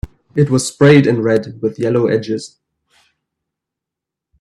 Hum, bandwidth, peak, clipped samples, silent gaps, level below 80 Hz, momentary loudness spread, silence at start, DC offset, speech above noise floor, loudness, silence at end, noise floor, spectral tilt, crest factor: none; 12.5 kHz; 0 dBFS; under 0.1%; none; -44 dBFS; 14 LU; 0.05 s; under 0.1%; 70 dB; -14 LUFS; 1.95 s; -84 dBFS; -6.5 dB/octave; 16 dB